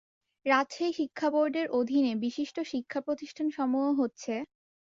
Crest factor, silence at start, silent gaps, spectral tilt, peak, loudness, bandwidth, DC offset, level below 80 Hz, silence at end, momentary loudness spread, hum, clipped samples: 20 dB; 0.45 s; none; -4.5 dB/octave; -12 dBFS; -30 LUFS; 7.6 kHz; under 0.1%; -76 dBFS; 0.5 s; 9 LU; none; under 0.1%